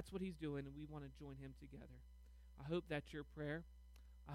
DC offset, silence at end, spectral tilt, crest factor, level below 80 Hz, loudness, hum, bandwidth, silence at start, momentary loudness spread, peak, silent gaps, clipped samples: under 0.1%; 0 s; -7 dB/octave; 20 dB; -62 dBFS; -50 LUFS; none; 16 kHz; 0 s; 18 LU; -32 dBFS; none; under 0.1%